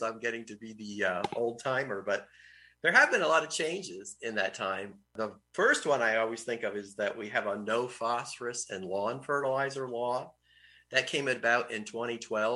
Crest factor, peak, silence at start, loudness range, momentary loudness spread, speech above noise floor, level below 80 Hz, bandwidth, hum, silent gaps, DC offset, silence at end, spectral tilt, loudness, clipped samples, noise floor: 22 dB; -10 dBFS; 0 s; 4 LU; 12 LU; 30 dB; -76 dBFS; 12 kHz; none; none; under 0.1%; 0 s; -3 dB/octave; -31 LUFS; under 0.1%; -61 dBFS